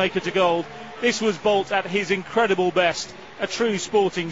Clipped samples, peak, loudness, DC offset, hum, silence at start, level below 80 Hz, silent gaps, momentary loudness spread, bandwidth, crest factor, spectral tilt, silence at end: under 0.1%; -6 dBFS; -22 LUFS; 0.3%; none; 0 s; -58 dBFS; none; 9 LU; 8 kHz; 16 dB; -4 dB/octave; 0 s